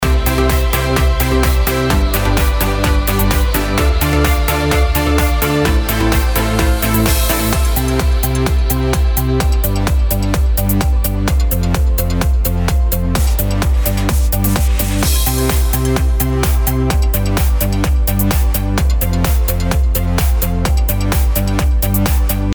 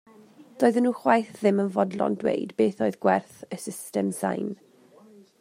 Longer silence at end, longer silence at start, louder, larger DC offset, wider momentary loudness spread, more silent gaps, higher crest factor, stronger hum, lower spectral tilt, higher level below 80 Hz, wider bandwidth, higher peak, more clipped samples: second, 0 s vs 0.85 s; second, 0 s vs 0.4 s; first, -15 LUFS vs -25 LUFS; neither; second, 2 LU vs 13 LU; neither; second, 14 dB vs 20 dB; neither; about the same, -5 dB/octave vs -6 dB/octave; first, -16 dBFS vs -74 dBFS; first, over 20 kHz vs 16 kHz; first, 0 dBFS vs -6 dBFS; neither